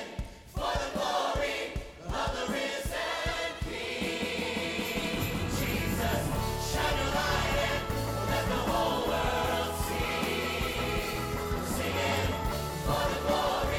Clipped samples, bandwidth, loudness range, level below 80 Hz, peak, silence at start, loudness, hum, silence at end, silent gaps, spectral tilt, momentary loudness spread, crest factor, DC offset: under 0.1%; 17.5 kHz; 3 LU; -40 dBFS; -16 dBFS; 0 s; -31 LUFS; none; 0 s; none; -4.5 dB/octave; 5 LU; 16 dB; under 0.1%